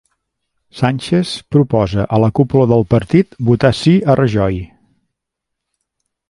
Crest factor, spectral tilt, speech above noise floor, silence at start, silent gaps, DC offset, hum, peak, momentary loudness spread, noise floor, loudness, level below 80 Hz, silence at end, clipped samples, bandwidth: 14 dB; -7.5 dB/octave; 65 dB; 0.75 s; none; under 0.1%; none; 0 dBFS; 6 LU; -78 dBFS; -14 LUFS; -40 dBFS; 1.65 s; under 0.1%; 11.5 kHz